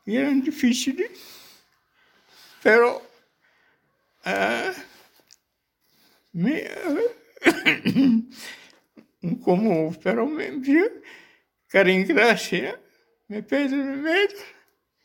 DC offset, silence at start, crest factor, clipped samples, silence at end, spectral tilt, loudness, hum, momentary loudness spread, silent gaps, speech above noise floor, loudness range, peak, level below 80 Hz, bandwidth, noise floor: under 0.1%; 0.05 s; 24 dB; under 0.1%; 0.55 s; -5 dB/octave; -22 LUFS; none; 18 LU; none; 52 dB; 7 LU; 0 dBFS; -70 dBFS; 17 kHz; -74 dBFS